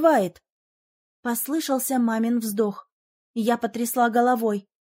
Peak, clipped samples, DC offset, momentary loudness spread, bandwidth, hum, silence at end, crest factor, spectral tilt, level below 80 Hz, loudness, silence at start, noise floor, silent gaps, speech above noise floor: -6 dBFS; under 0.1%; under 0.1%; 9 LU; 16.5 kHz; none; 0.2 s; 18 dB; -4.5 dB/octave; -74 dBFS; -24 LUFS; 0 s; under -90 dBFS; 0.52-1.23 s, 2.92-3.34 s; over 67 dB